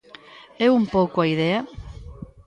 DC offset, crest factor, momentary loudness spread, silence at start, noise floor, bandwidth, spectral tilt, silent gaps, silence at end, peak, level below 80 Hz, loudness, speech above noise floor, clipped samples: under 0.1%; 16 dB; 21 LU; 0.35 s; -46 dBFS; 9.4 kHz; -7.5 dB/octave; none; 0.2 s; -6 dBFS; -46 dBFS; -21 LUFS; 26 dB; under 0.1%